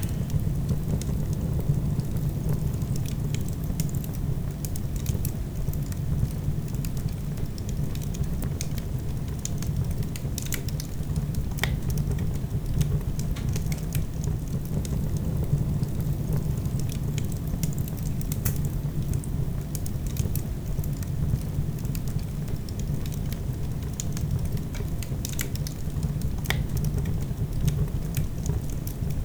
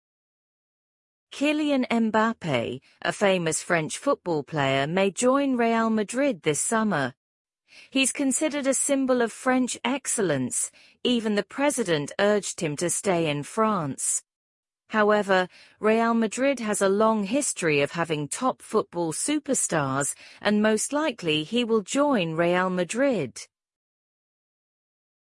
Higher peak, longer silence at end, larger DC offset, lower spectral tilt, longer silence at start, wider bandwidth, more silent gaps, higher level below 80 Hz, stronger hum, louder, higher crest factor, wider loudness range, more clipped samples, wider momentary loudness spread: first, -4 dBFS vs -8 dBFS; second, 0 s vs 1.8 s; neither; first, -6 dB/octave vs -4 dB/octave; second, 0 s vs 1.3 s; first, over 20 kHz vs 12 kHz; second, none vs 7.17-7.45 s, 14.36-14.63 s; first, -34 dBFS vs -68 dBFS; neither; second, -29 LUFS vs -25 LUFS; about the same, 22 dB vs 18 dB; about the same, 2 LU vs 2 LU; neither; about the same, 4 LU vs 6 LU